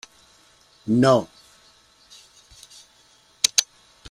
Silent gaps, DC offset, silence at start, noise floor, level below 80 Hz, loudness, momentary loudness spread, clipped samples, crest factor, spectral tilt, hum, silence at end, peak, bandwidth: none; under 0.1%; 0.85 s; -57 dBFS; -60 dBFS; -20 LUFS; 24 LU; under 0.1%; 26 dB; -3.5 dB/octave; none; 0.45 s; 0 dBFS; 16 kHz